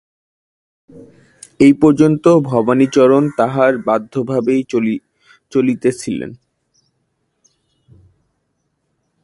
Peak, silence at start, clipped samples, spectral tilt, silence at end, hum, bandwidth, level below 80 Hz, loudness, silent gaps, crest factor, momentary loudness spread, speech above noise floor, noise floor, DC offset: 0 dBFS; 0.95 s; under 0.1%; -7 dB/octave; 2.9 s; none; 11.5 kHz; -54 dBFS; -14 LUFS; none; 16 dB; 11 LU; 55 dB; -68 dBFS; under 0.1%